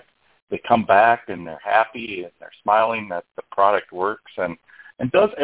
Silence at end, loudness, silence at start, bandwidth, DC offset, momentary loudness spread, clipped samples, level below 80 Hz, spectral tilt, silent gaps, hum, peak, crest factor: 0 s; -21 LUFS; 0.5 s; 4 kHz; under 0.1%; 16 LU; under 0.1%; -58 dBFS; -9 dB/octave; none; none; -2 dBFS; 20 dB